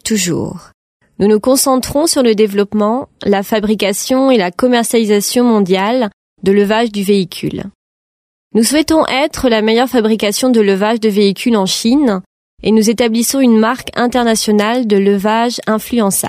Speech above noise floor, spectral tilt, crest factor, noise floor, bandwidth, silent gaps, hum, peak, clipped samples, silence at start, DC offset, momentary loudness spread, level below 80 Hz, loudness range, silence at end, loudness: over 78 dB; -4 dB/octave; 12 dB; under -90 dBFS; 16 kHz; 0.74-1.00 s, 6.13-6.36 s, 7.75-8.51 s, 12.26-12.58 s; none; 0 dBFS; under 0.1%; 0.05 s; under 0.1%; 6 LU; -44 dBFS; 2 LU; 0 s; -13 LUFS